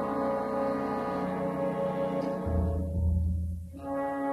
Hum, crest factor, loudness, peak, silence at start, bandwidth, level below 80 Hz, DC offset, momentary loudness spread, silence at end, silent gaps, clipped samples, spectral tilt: none; 12 dB; -31 LUFS; -18 dBFS; 0 s; 12.5 kHz; -38 dBFS; under 0.1%; 4 LU; 0 s; none; under 0.1%; -9 dB/octave